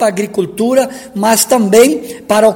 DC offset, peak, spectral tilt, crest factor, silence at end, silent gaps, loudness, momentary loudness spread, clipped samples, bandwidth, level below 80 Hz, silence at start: under 0.1%; 0 dBFS; -4 dB/octave; 12 dB; 0 s; none; -12 LUFS; 9 LU; 0.8%; over 20 kHz; -54 dBFS; 0 s